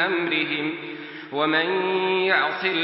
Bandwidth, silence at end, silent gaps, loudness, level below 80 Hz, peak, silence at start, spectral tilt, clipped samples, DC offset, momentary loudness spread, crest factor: 5.8 kHz; 0 s; none; -22 LUFS; -82 dBFS; -6 dBFS; 0 s; -9 dB/octave; under 0.1%; under 0.1%; 12 LU; 18 dB